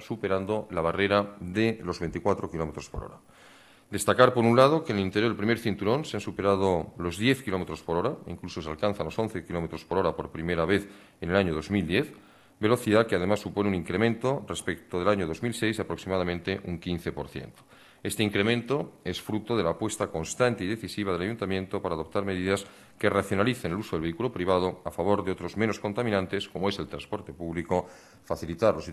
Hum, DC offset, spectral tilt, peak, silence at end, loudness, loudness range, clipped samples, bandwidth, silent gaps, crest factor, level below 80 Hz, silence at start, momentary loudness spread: none; under 0.1%; -5.5 dB/octave; -6 dBFS; 0 s; -28 LUFS; 5 LU; under 0.1%; 13 kHz; none; 22 dB; -54 dBFS; 0 s; 11 LU